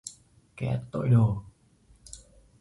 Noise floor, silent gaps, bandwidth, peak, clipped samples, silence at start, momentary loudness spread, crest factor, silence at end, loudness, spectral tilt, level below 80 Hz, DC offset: -61 dBFS; none; 11.5 kHz; -10 dBFS; under 0.1%; 0.05 s; 24 LU; 18 dB; 0.45 s; -27 LUFS; -7.5 dB/octave; -52 dBFS; under 0.1%